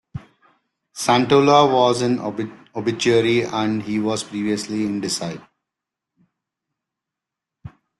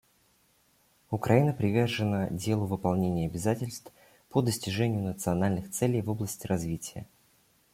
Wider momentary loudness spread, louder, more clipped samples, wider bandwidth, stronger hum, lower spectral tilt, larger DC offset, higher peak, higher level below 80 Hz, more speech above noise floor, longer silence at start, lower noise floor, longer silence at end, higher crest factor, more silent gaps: first, 16 LU vs 10 LU; first, -19 LUFS vs -29 LUFS; neither; second, 12.5 kHz vs 16.5 kHz; neither; about the same, -5 dB/octave vs -6 dB/octave; neither; first, -2 dBFS vs -8 dBFS; about the same, -58 dBFS vs -58 dBFS; first, 67 dB vs 38 dB; second, 0.15 s vs 1.1 s; first, -85 dBFS vs -67 dBFS; second, 0.3 s vs 0.7 s; about the same, 20 dB vs 22 dB; neither